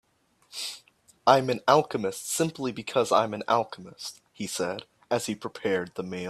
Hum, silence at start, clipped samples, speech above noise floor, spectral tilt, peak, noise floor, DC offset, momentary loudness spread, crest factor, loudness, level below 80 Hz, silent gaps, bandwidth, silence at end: none; 0.55 s; under 0.1%; 38 dB; -4 dB/octave; -4 dBFS; -65 dBFS; under 0.1%; 16 LU; 24 dB; -27 LUFS; -70 dBFS; none; 15.5 kHz; 0 s